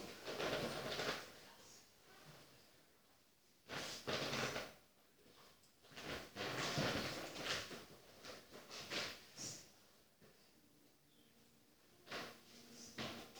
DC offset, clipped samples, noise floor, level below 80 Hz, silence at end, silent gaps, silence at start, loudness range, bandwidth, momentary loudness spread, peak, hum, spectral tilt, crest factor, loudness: under 0.1%; under 0.1%; -73 dBFS; -74 dBFS; 0 s; none; 0 s; 10 LU; over 20 kHz; 24 LU; -26 dBFS; none; -3 dB/octave; 24 dB; -46 LUFS